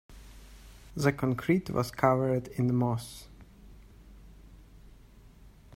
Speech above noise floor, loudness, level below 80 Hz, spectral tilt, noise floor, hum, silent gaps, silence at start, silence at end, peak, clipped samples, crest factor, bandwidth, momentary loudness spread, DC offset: 26 dB; -29 LUFS; -54 dBFS; -7 dB/octave; -54 dBFS; none; none; 0.1 s; 0.3 s; -10 dBFS; under 0.1%; 22 dB; 16 kHz; 19 LU; under 0.1%